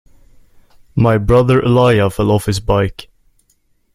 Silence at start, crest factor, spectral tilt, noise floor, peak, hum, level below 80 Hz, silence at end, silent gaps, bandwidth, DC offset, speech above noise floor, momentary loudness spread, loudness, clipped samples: 0.95 s; 14 dB; -7 dB/octave; -59 dBFS; 0 dBFS; none; -32 dBFS; 0.9 s; none; 15 kHz; under 0.1%; 46 dB; 5 LU; -14 LUFS; under 0.1%